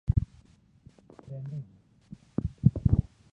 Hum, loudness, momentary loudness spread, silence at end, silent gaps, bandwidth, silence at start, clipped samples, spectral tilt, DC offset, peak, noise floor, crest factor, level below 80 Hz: none; -30 LUFS; 24 LU; 0.3 s; none; 4.9 kHz; 0.1 s; under 0.1%; -11.5 dB/octave; under 0.1%; -6 dBFS; -59 dBFS; 24 dB; -38 dBFS